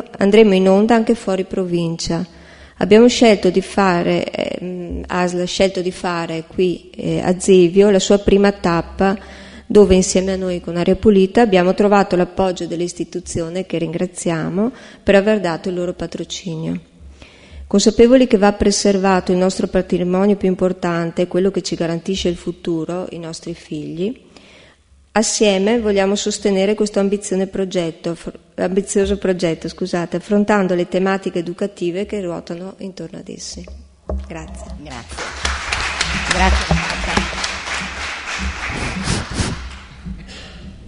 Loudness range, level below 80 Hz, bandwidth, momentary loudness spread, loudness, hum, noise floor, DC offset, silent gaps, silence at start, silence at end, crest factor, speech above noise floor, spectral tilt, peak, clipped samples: 9 LU; -34 dBFS; 11 kHz; 16 LU; -17 LUFS; none; -50 dBFS; under 0.1%; none; 0 s; 0 s; 18 dB; 34 dB; -5 dB/octave; 0 dBFS; under 0.1%